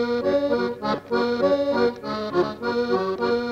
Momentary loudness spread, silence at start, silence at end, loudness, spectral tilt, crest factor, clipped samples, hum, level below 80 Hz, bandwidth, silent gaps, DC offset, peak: 4 LU; 0 s; 0 s; -23 LUFS; -6.5 dB/octave; 14 dB; under 0.1%; none; -56 dBFS; 8 kHz; none; under 0.1%; -8 dBFS